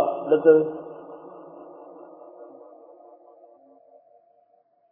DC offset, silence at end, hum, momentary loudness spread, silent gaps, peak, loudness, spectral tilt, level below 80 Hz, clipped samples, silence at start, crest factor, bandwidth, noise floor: under 0.1%; 2.45 s; none; 28 LU; none; -4 dBFS; -20 LUFS; -10.5 dB/octave; -74 dBFS; under 0.1%; 0 s; 22 dB; 3.4 kHz; -63 dBFS